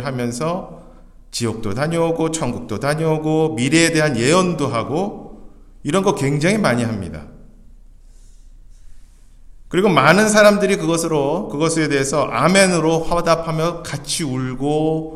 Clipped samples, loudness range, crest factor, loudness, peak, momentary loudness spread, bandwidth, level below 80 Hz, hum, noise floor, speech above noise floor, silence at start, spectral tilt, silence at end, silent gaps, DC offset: under 0.1%; 7 LU; 18 dB; -17 LUFS; 0 dBFS; 11 LU; 14.5 kHz; -42 dBFS; none; -42 dBFS; 25 dB; 0 s; -5 dB/octave; 0 s; none; under 0.1%